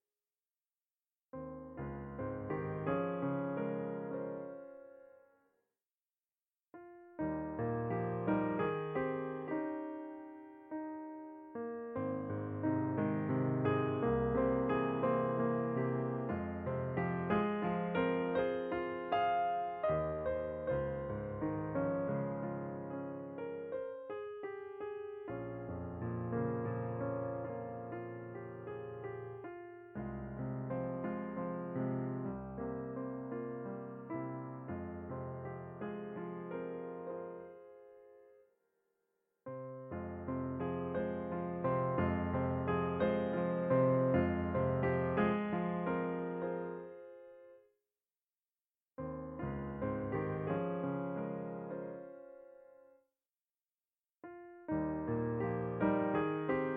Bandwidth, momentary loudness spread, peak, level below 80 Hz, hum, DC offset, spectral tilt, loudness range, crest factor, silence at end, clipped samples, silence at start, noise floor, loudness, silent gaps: 4.6 kHz; 14 LU; -20 dBFS; -60 dBFS; none; under 0.1%; -11 dB/octave; 12 LU; 18 dB; 0 s; under 0.1%; 1.35 s; under -90 dBFS; -38 LUFS; none